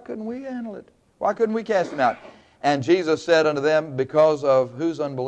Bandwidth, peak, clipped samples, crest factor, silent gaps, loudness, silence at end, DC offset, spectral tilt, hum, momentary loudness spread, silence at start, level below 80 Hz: 9.8 kHz; -6 dBFS; under 0.1%; 16 dB; none; -22 LUFS; 0 s; under 0.1%; -5.5 dB/octave; none; 13 LU; 0.1 s; -66 dBFS